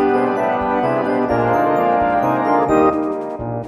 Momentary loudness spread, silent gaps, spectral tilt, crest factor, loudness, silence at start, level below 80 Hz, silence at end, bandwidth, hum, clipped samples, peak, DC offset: 6 LU; none; -8 dB/octave; 16 dB; -17 LUFS; 0 s; -44 dBFS; 0 s; 14 kHz; none; under 0.1%; -2 dBFS; under 0.1%